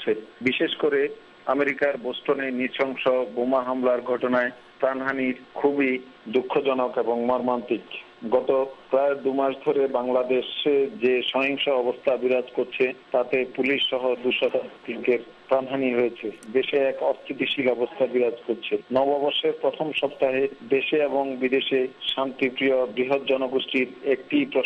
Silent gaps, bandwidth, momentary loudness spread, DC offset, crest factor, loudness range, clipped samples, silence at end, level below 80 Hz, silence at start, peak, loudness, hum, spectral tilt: none; 6.2 kHz; 5 LU; under 0.1%; 14 dB; 2 LU; under 0.1%; 0 s; -68 dBFS; 0 s; -10 dBFS; -24 LUFS; none; -6 dB/octave